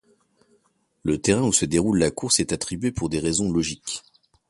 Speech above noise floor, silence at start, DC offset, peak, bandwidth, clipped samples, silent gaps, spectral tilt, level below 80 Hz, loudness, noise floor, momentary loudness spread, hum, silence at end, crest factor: 44 dB; 1.05 s; under 0.1%; -4 dBFS; 12 kHz; under 0.1%; none; -4 dB/octave; -46 dBFS; -23 LUFS; -66 dBFS; 11 LU; none; 0.5 s; 20 dB